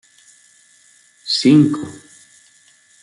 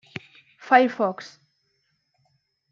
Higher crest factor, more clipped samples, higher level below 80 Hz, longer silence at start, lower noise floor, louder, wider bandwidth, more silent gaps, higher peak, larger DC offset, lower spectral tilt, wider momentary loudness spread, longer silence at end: second, 18 dB vs 24 dB; neither; first, -64 dBFS vs -80 dBFS; first, 1.25 s vs 0.65 s; second, -52 dBFS vs -72 dBFS; first, -15 LUFS vs -21 LUFS; first, 11.5 kHz vs 7.4 kHz; neither; about the same, -2 dBFS vs -2 dBFS; neither; about the same, -5.5 dB/octave vs -5.5 dB/octave; about the same, 22 LU vs 22 LU; second, 1.05 s vs 1.45 s